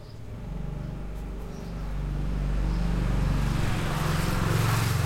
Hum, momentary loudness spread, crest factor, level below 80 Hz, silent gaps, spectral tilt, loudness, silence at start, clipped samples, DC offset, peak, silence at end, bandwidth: none; 13 LU; 14 dB; -32 dBFS; none; -6 dB/octave; -29 LUFS; 0 s; under 0.1%; under 0.1%; -14 dBFS; 0 s; 16.5 kHz